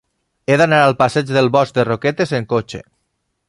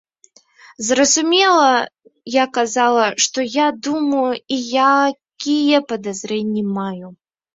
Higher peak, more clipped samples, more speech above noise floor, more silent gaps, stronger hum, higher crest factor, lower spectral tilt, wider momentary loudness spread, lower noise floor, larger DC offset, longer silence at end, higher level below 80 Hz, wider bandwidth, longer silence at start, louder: about the same, 0 dBFS vs -2 dBFS; neither; first, 55 dB vs 37 dB; neither; neither; about the same, 16 dB vs 16 dB; first, -6 dB/octave vs -2.5 dB/octave; about the same, 12 LU vs 12 LU; first, -70 dBFS vs -53 dBFS; neither; first, 0.7 s vs 0.4 s; first, -52 dBFS vs -64 dBFS; first, 11.5 kHz vs 7.8 kHz; second, 0.5 s vs 0.8 s; about the same, -15 LUFS vs -17 LUFS